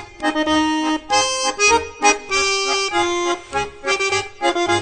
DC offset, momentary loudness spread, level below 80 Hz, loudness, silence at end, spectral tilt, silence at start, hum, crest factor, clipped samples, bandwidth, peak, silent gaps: under 0.1%; 6 LU; -46 dBFS; -18 LUFS; 0 s; -1.5 dB/octave; 0 s; none; 18 dB; under 0.1%; 9.4 kHz; -2 dBFS; none